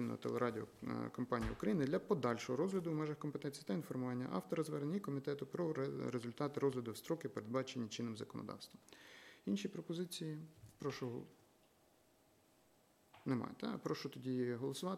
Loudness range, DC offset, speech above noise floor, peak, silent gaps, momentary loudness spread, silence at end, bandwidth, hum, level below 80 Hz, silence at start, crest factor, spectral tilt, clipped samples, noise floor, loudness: 8 LU; under 0.1%; 31 dB; -22 dBFS; none; 11 LU; 0 s; 16.5 kHz; none; -68 dBFS; 0 s; 20 dB; -6.5 dB/octave; under 0.1%; -72 dBFS; -43 LUFS